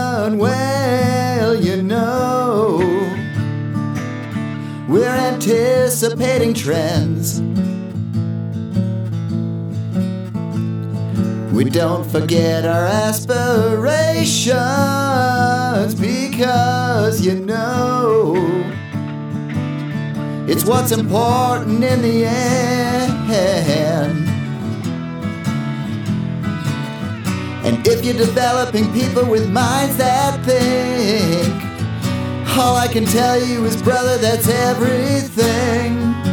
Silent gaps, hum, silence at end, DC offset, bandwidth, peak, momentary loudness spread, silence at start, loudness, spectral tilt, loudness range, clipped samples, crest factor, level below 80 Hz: none; none; 0 s; under 0.1%; 19.5 kHz; -2 dBFS; 8 LU; 0 s; -17 LUFS; -5.5 dB/octave; 5 LU; under 0.1%; 14 dB; -48 dBFS